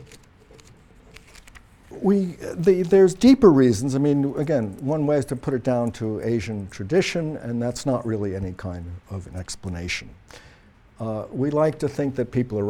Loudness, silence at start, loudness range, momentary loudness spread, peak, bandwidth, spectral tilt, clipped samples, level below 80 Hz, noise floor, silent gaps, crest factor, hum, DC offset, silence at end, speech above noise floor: -22 LUFS; 0 s; 11 LU; 17 LU; -4 dBFS; 13 kHz; -6.5 dB/octave; under 0.1%; -48 dBFS; -52 dBFS; none; 20 dB; none; under 0.1%; 0 s; 30 dB